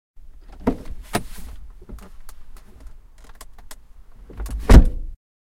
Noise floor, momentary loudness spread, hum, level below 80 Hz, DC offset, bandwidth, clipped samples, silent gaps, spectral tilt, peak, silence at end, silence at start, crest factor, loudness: -42 dBFS; 29 LU; none; -22 dBFS; under 0.1%; 16 kHz; 0.1%; none; -6.5 dB/octave; 0 dBFS; 0.3 s; 0.15 s; 22 dB; -20 LUFS